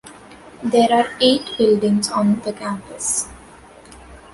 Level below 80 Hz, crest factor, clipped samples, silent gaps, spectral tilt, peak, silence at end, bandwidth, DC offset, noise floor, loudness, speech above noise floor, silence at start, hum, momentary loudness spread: -52 dBFS; 16 dB; under 0.1%; none; -4 dB/octave; -2 dBFS; 0.15 s; 11.5 kHz; under 0.1%; -43 dBFS; -18 LUFS; 26 dB; 0.05 s; none; 12 LU